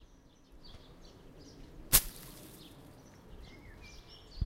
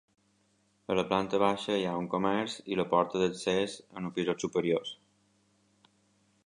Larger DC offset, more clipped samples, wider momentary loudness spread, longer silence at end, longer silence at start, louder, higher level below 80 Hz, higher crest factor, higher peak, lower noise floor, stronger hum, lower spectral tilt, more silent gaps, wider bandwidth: neither; neither; first, 29 LU vs 9 LU; second, 0 s vs 1.55 s; second, 0 s vs 0.9 s; first, -28 LUFS vs -31 LUFS; first, -50 dBFS vs -66 dBFS; first, 34 dB vs 20 dB; first, -6 dBFS vs -12 dBFS; second, -60 dBFS vs -71 dBFS; neither; second, -1.5 dB/octave vs -5 dB/octave; neither; first, 16 kHz vs 11 kHz